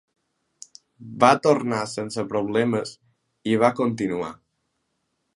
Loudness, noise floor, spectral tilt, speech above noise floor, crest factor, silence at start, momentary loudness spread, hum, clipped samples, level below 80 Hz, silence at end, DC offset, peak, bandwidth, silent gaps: -22 LUFS; -75 dBFS; -5.5 dB/octave; 53 dB; 24 dB; 1 s; 15 LU; none; under 0.1%; -64 dBFS; 1 s; under 0.1%; 0 dBFS; 11.5 kHz; none